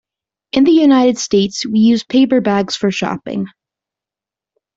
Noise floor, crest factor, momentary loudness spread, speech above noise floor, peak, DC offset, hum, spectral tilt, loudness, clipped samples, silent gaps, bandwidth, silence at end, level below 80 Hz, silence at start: -88 dBFS; 12 dB; 12 LU; 75 dB; -2 dBFS; under 0.1%; none; -5 dB/octave; -14 LUFS; under 0.1%; none; 7.8 kHz; 1.3 s; -54 dBFS; 0.55 s